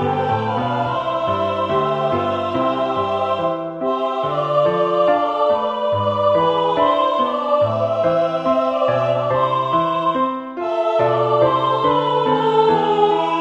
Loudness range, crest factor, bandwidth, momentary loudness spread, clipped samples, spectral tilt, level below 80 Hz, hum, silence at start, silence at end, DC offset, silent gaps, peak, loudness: 3 LU; 14 dB; 8.2 kHz; 5 LU; under 0.1%; -7 dB/octave; -56 dBFS; none; 0 s; 0 s; under 0.1%; none; -4 dBFS; -18 LUFS